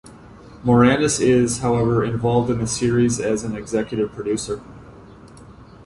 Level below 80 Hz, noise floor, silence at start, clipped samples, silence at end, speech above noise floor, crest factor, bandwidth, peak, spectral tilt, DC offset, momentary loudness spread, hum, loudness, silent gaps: -44 dBFS; -43 dBFS; 0.05 s; under 0.1%; 0.05 s; 24 dB; 18 dB; 11.5 kHz; -2 dBFS; -5.5 dB/octave; under 0.1%; 9 LU; none; -19 LUFS; none